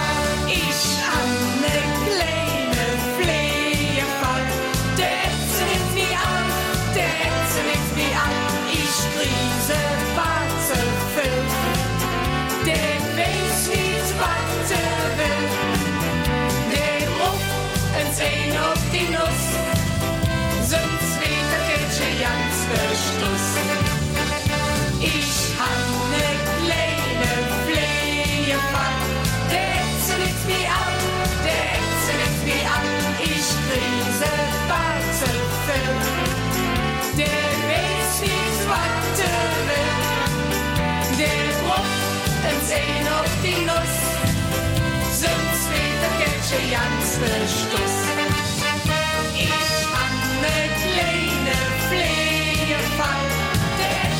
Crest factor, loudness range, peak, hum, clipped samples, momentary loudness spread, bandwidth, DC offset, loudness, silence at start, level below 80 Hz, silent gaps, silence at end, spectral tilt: 14 dB; 1 LU; -8 dBFS; none; under 0.1%; 2 LU; 17 kHz; under 0.1%; -21 LUFS; 0 s; -34 dBFS; none; 0 s; -3.5 dB/octave